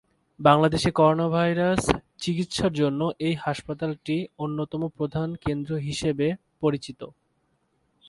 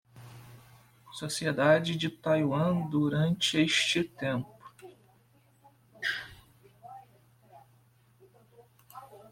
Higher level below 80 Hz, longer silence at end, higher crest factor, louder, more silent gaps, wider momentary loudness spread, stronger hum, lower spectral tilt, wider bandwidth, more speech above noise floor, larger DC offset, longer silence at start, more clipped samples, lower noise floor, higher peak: first, -50 dBFS vs -66 dBFS; first, 1 s vs 0.15 s; about the same, 24 dB vs 22 dB; first, -25 LUFS vs -29 LUFS; neither; second, 10 LU vs 26 LU; neither; first, -6 dB/octave vs -4.5 dB/octave; second, 11.5 kHz vs 16.5 kHz; first, 46 dB vs 36 dB; neither; first, 0.4 s vs 0.15 s; neither; first, -70 dBFS vs -64 dBFS; first, -2 dBFS vs -10 dBFS